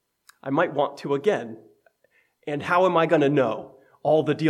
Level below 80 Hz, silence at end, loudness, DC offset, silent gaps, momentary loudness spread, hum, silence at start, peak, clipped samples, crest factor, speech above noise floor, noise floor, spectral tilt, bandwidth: -74 dBFS; 0 s; -23 LUFS; under 0.1%; none; 15 LU; none; 0.45 s; -6 dBFS; under 0.1%; 18 dB; 43 dB; -66 dBFS; -7 dB/octave; 12.5 kHz